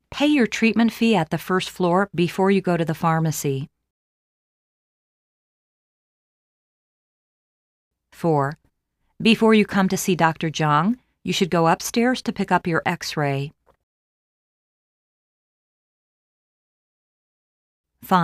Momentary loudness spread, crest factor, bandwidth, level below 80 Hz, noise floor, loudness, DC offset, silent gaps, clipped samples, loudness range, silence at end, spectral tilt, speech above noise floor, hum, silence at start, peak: 7 LU; 20 dB; 15.5 kHz; -58 dBFS; -72 dBFS; -21 LUFS; under 0.1%; 3.90-7.91 s, 13.83-17.84 s; under 0.1%; 10 LU; 0 s; -5.5 dB/octave; 52 dB; none; 0.1 s; -2 dBFS